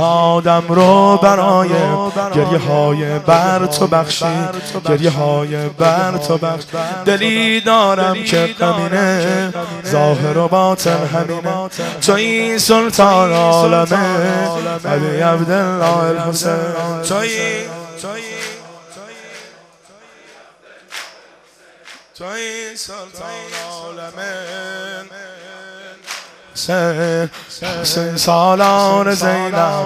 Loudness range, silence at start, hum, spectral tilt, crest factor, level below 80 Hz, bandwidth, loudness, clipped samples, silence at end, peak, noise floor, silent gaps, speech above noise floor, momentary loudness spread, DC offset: 16 LU; 0 s; none; -4.5 dB/octave; 16 dB; -54 dBFS; 15 kHz; -14 LUFS; under 0.1%; 0 s; 0 dBFS; -47 dBFS; none; 32 dB; 18 LU; under 0.1%